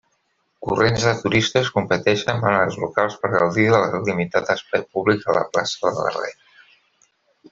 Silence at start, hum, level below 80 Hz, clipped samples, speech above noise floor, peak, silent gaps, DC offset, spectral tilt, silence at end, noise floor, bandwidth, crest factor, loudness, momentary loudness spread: 0.6 s; none; -54 dBFS; under 0.1%; 49 dB; -2 dBFS; none; under 0.1%; -5 dB/octave; 1.2 s; -68 dBFS; 7.8 kHz; 18 dB; -20 LUFS; 6 LU